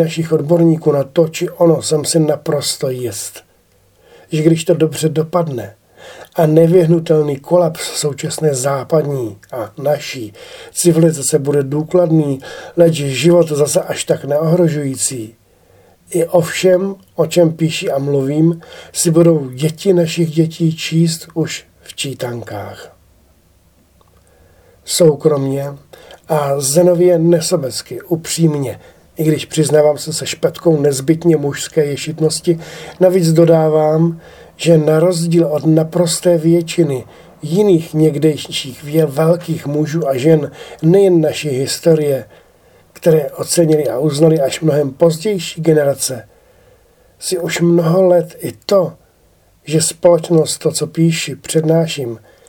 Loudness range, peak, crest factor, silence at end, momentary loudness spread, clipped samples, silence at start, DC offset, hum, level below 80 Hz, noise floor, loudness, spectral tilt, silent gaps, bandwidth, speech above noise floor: 4 LU; 0 dBFS; 14 dB; 0.3 s; 12 LU; under 0.1%; 0 s; under 0.1%; none; -54 dBFS; -53 dBFS; -14 LUFS; -5.5 dB/octave; none; 18 kHz; 39 dB